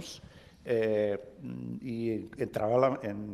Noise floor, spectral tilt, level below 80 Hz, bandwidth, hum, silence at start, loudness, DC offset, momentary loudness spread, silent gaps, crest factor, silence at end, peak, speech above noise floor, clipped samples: -53 dBFS; -7 dB/octave; -64 dBFS; 14.5 kHz; none; 0 s; -32 LUFS; under 0.1%; 16 LU; none; 20 dB; 0 s; -12 dBFS; 22 dB; under 0.1%